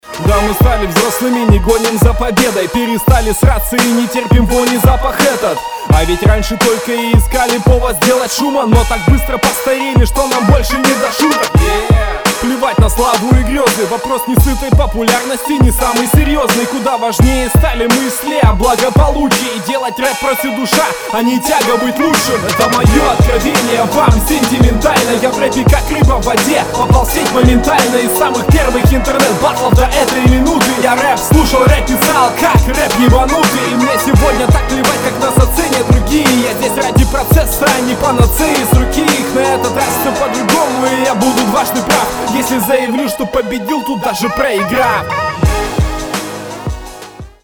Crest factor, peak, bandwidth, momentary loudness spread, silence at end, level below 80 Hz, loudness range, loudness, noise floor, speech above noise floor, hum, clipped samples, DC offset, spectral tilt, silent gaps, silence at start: 10 dB; 0 dBFS; over 20 kHz; 5 LU; 0.15 s; -18 dBFS; 2 LU; -11 LUFS; -31 dBFS; 20 dB; none; 0.5%; 0.2%; -5 dB/octave; none; 0.05 s